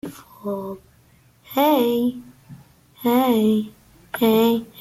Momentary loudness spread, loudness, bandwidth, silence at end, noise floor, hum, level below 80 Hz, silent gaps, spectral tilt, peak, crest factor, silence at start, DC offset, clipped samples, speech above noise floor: 18 LU; -20 LUFS; 15.5 kHz; 0 s; -55 dBFS; none; -60 dBFS; none; -5.5 dB/octave; -6 dBFS; 16 dB; 0.05 s; under 0.1%; under 0.1%; 36 dB